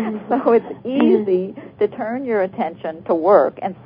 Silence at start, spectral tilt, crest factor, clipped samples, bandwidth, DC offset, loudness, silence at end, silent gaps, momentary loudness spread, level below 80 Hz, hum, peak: 0 s; -11.5 dB/octave; 18 dB; under 0.1%; 5.2 kHz; under 0.1%; -18 LUFS; 0 s; none; 11 LU; -62 dBFS; none; 0 dBFS